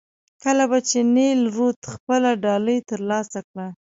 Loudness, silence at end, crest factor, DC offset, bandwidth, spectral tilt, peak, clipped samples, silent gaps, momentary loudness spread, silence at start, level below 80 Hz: -20 LUFS; 0.25 s; 14 dB; under 0.1%; 7.8 kHz; -4 dB/octave; -8 dBFS; under 0.1%; 1.76-1.82 s, 2.00-2.07 s, 3.44-3.54 s; 14 LU; 0.45 s; -66 dBFS